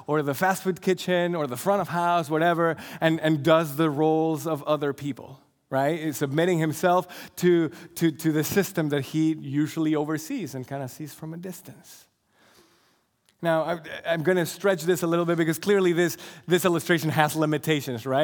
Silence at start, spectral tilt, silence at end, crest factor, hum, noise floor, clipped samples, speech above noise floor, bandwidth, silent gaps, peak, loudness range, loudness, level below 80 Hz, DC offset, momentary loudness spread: 0 s; -5.5 dB/octave; 0 s; 22 dB; none; -67 dBFS; under 0.1%; 42 dB; 19.5 kHz; none; -2 dBFS; 8 LU; -25 LUFS; -70 dBFS; under 0.1%; 11 LU